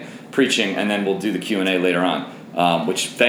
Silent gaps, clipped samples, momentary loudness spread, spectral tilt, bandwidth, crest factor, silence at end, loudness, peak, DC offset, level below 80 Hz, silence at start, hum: none; under 0.1%; 6 LU; -4 dB/octave; over 20 kHz; 18 dB; 0 s; -20 LUFS; -2 dBFS; under 0.1%; -70 dBFS; 0 s; none